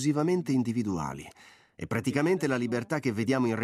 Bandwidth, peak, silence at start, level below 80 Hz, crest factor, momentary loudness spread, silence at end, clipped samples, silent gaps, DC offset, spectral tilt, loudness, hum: 15 kHz; -12 dBFS; 0 s; -64 dBFS; 18 dB; 11 LU; 0 s; under 0.1%; none; under 0.1%; -6.5 dB/octave; -29 LUFS; none